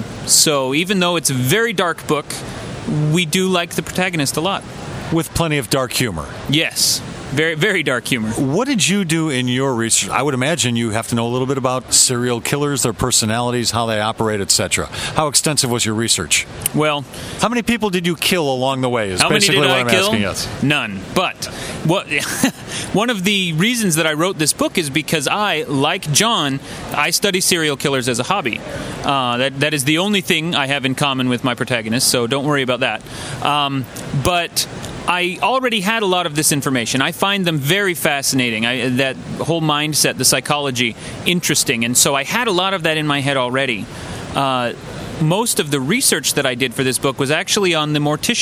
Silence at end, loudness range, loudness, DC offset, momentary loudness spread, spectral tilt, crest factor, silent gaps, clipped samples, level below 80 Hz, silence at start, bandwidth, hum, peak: 0 s; 3 LU; -16 LUFS; under 0.1%; 7 LU; -3 dB/octave; 18 dB; none; under 0.1%; -46 dBFS; 0 s; over 20 kHz; none; 0 dBFS